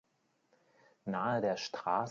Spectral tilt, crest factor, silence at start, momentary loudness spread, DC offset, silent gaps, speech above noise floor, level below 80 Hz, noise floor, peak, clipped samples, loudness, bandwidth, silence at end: -4 dB/octave; 20 dB; 1.05 s; 7 LU; under 0.1%; none; 42 dB; -80 dBFS; -77 dBFS; -18 dBFS; under 0.1%; -35 LUFS; 7.6 kHz; 0 s